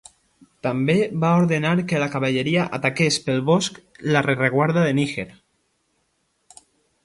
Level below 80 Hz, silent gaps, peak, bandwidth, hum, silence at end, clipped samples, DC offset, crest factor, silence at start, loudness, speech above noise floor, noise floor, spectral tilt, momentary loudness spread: -60 dBFS; none; -2 dBFS; 11.5 kHz; none; 1.75 s; under 0.1%; under 0.1%; 20 dB; 0.65 s; -21 LUFS; 49 dB; -69 dBFS; -5.5 dB/octave; 8 LU